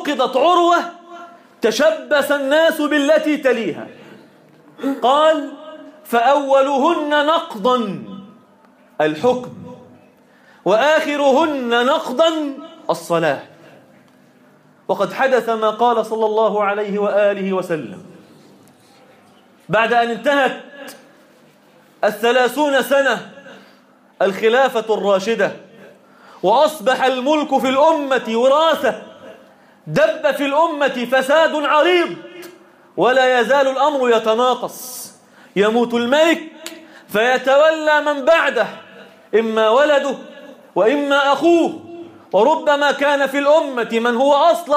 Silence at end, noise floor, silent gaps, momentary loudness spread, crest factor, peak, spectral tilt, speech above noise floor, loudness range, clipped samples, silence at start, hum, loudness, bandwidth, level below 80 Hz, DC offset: 0 s; -50 dBFS; none; 16 LU; 14 dB; -4 dBFS; -4 dB/octave; 35 dB; 5 LU; under 0.1%; 0 s; none; -16 LUFS; 15.5 kHz; -68 dBFS; under 0.1%